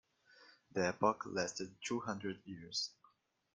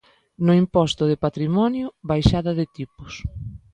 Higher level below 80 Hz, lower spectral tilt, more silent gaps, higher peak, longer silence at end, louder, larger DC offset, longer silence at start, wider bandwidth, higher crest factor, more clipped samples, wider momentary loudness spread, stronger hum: second, -78 dBFS vs -38 dBFS; second, -3.5 dB/octave vs -7.5 dB/octave; neither; second, -18 dBFS vs 0 dBFS; first, 0.65 s vs 0.15 s; second, -40 LUFS vs -21 LUFS; neither; about the same, 0.4 s vs 0.4 s; first, 10.5 kHz vs 9.4 kHz; about the same, 22 dB vs 20 dB; neither; second, 10 LU vs 15 LU; neither